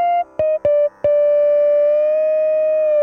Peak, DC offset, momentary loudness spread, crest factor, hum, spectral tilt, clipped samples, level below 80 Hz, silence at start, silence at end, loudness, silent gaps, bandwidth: -8 dBFS; under 0.1%; 4 LU; 8 dB; none; -7 dB/octave; under 0.1%; -56 dBFS; 0 s; 0 s; -16 LUFS; none; 3.3 kHz